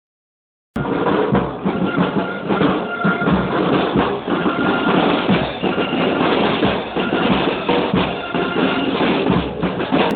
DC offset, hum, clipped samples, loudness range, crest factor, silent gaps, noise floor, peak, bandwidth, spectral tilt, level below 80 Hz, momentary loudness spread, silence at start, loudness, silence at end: under 0.1%; none; under 0.1%; 1 LU; 16 dB; none; under -90 dBFS; -2 dBFS; 4.7 kHz; -8.5 dB/octave; -42 dBFS; 5 LU; 0.75 s; -18 LUFS; 0 s